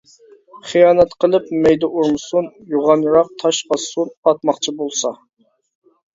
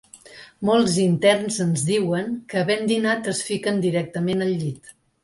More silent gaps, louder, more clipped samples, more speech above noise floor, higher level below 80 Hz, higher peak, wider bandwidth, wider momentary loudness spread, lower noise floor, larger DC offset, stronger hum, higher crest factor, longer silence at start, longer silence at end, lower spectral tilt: first, 4.17-4.23 s vs none; first, -16 LUFS vs -22 LUFS; neither; first, 32 dB vs 24 dB; first, -54 dBFS vs -60 dBFS; first, 0 dBFS vs -6 dBFS; second, 7.8 kHz vs 11.5 kHz; about the same, 9 LU vs 9 LU; about the same, -48 dBFS vs -45 dBFS; neither; neither; about the same, 16 dB vs 16 dB; first, 0.55 s vs 0.15 s; first, 1 s vs 0.35 s; about the same, -4 dB/octave vs -5 dB/octave